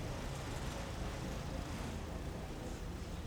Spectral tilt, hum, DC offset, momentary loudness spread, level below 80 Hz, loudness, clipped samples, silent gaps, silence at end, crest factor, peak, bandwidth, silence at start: -5.5 dB/octave; none; under 0.1%; 3 LU; -48 dBFS; -44 LUFS; under 0.1%; none; 0 s; 14 dB; -28 dBFS; over 20 kHz; 0 s